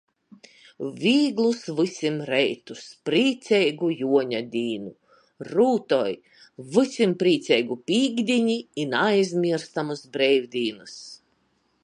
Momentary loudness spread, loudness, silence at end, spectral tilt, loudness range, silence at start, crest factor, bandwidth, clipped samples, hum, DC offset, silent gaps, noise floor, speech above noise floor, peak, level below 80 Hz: 14 LU; -23 LUFS; 0.7 s; -5 dB/octave; 2 LU; 0.8 s; 18 dB; 11 kHz; under 0.1%; none; under 0.1%; none; -68 dBFS; 45 dB; -6 dBFS; -74 dBFS